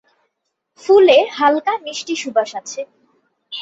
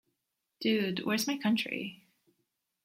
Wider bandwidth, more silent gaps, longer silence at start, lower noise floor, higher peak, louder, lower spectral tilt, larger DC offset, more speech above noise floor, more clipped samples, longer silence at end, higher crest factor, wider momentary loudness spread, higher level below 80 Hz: second, 8 kHz vs 16.5 kHz; neither; first, 0.85 s vs 0.6 s; second, -74 dBFS vs -84 dBFS; first, -2 dBFS vs -18 dBFS; first, -15 LUFS vs -31 LUFS; second, -2 dB/octave vs -4 dB/octave; neither; first, 59 dB vs 53 dB; neither; second, 0 s vs 0.9 s; about the same, 16 dB vs 16 dB; first, 20 LU vs 7 LU; first, -66 dBFS vs -78 dBFS